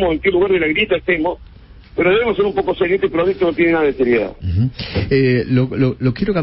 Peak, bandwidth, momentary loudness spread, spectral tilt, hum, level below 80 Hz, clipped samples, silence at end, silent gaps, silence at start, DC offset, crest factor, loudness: -4 dBFS; 5.8 kHz; 5 LU; -11.5 dB/octave; none; -38 dBFS; under 0.1%; 0 s; none; 0 s; under 0.1%; 12 dB; -16 LUFS